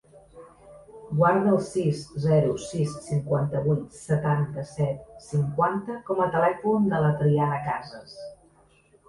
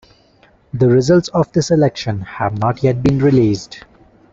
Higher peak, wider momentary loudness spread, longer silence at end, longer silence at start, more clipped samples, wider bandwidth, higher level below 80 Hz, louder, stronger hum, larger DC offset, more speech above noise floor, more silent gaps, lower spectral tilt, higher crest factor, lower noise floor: second, -8 dBFS vs -2 dBFS; about the same, 10 LU vs 11 LU; first, 0.75 s vs 0.5 s; second, 0.15 s vs 0.75 s; neither; first, 11.5 kHz vs 7.8 kHz; second, -56 dBFS vs -44 dBFS; second, -25 LUFS vs -15 LUFS; neither; neither; about the same, 35 dB vs 37 dB; neither; about the same, -8 dB/octave vs -7 dB/octave; about the same, 16 dB vs 14 dB; first, -59 dBFS vs -51 dBFS